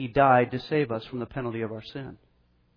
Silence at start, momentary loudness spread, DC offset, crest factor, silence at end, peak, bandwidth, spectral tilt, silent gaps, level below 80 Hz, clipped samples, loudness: 0 s; 19 LU; under 0.1%; 20 dB; 0.6 s; -8 dBFS; 5.4 kHz; -9 dB/octave; none; -56 dBFS; under 0.1%; -26 LUFS